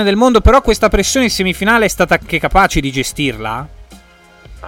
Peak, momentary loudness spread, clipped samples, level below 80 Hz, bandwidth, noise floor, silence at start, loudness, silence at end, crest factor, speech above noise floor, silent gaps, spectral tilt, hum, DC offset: 0 dBFS; 10 LU; under 0.1%; -24 dBFS; 17 kHz; -43 dBFS; 0 s; -13 LUFS; 0 s; 14 dB; 30 dB; none; -4 dB/octave; none; under 0.1%